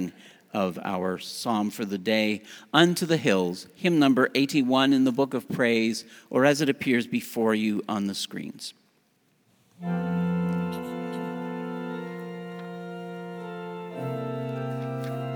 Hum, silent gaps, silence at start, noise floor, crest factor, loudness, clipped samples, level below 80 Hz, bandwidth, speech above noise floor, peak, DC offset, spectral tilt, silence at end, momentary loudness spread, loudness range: none; none; 0 s; -67 dBFS; 24 dB; -26 LUFS; under 0.1%; -72 dBFS; over 20 kHz; 42 dB; -2 dBFS; under 0.1%; -5.5 dB/octave; 0 s; 16 LU; 12 LU